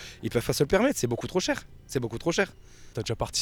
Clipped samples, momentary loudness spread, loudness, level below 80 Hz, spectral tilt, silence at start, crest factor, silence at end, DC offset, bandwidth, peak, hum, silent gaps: under 0.1%; 10 LU; -28 LUFS; -48 dBFS; -4.5 dB/octave; 0 s; 18 dB; 0 s; under 0.1%; 19.5 kHz; -10 dBFS; none; none